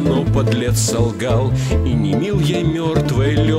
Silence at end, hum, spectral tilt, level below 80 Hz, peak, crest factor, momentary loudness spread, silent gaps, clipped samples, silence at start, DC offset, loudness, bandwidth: 0 s; none; -6 dB/octave; -28 dBFS; -2 dBFS; 12 dB; 2 LU; none; under 0.1%; 0 s; 0.1%; -17 LUFS; 15.5 kHz